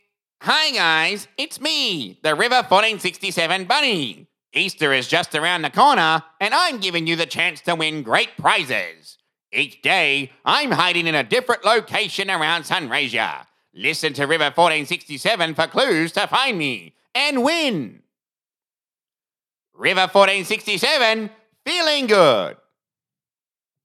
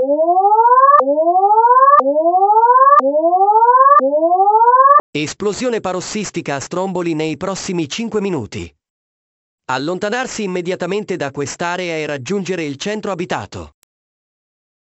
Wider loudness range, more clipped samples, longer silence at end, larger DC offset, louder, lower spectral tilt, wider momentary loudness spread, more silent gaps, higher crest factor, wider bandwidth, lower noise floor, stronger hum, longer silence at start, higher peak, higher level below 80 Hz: second, 3 LU vs 12 LU; neither; about the same, 1.3 s vs 1.2 s; neither; second, -18 LUFS vs -14 LUFS; about the same, -3 dB/octave vs -4 dB/octave; second, 9 LU vs 13 LU; second, none vs 5.00-5.13 s, 8.90-9.58 s; first, 20 dB vs 14 dB; first, 16.5 kHz vs 8 kHz; about the same, under -90 dBFS vs under -90 dBFS; neither; first, 0.4 s vs 0 s; about the same, 0 dBFS vs 0 dBFS; second, -78 dBFS vs -54 dBFS